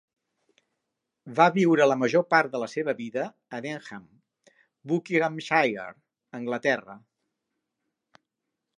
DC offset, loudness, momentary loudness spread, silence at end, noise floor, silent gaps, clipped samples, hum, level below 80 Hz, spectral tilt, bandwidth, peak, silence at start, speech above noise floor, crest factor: under 0.1%; -25 LUFS; 17 LU; 1.8 s; -84 dBFS; none; under 0.1%; none; -80 dBFS; -6 dB/octave; 10.5 kHz; -4 dBFS; 1.25 s; 59 dB; 24 dB